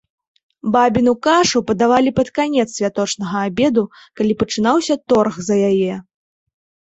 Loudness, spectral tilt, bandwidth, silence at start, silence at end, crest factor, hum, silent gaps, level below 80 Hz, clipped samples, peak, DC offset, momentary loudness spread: -17 LUFS; -4.5 dB/octave; 8.2 kHz; 0.65 s; 0.9 s; 16 dB; none; none; -50 dBFS; under 0.1%; -2 dBFS; under 0.1%; 7 LU